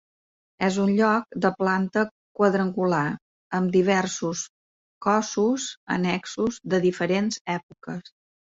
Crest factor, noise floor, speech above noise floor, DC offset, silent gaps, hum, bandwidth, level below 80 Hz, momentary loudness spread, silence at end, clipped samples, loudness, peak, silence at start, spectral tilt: 18 dB; under -90 dBFS; over 66 dB; under 0.1%; 2.11-2.35 s, 3.22-3.50 s, 4.49-5.01 s, 5.77-5.87 s, 7.41-7.45 s, 7.63-7.69 s; none; 8 kHz; -64 dBFS; 10 LU; 0.45 s; under 0.1%; -24 LUFS; -8 dBFS; 0.6 s; -5.5 dB/octave